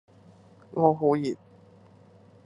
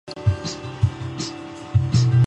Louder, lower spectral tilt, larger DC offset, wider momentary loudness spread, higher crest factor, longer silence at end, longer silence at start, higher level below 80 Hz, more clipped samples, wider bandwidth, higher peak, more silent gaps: about the same, -25 LUFS vs -23 LUFS; first, -8.5 dB/octave vs -6 dB/octave; neither; first, 15 LU vs 12 LU; first, 22 dB vs 14 dB; first, 1.1 s vs 0 s; first, 0.75 s vs 0.05 s; second, -76 dBFS vs -36 dBFS; neither; first, 10.5 kHz vs 8.8 kHz; about the same, -6 dBFS vs -6 dBFS; neither